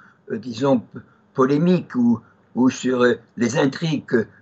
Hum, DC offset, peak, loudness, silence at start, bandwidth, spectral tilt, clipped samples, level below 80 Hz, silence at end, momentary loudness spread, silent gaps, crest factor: none; under 0.1%; -6 dBFS; -20 LUFS; 0.3 s; 8 kHz; -6.5 dB/octave; under 0.1%; -68 dBFS; 0.15 s; 13 LU; none; 16 dB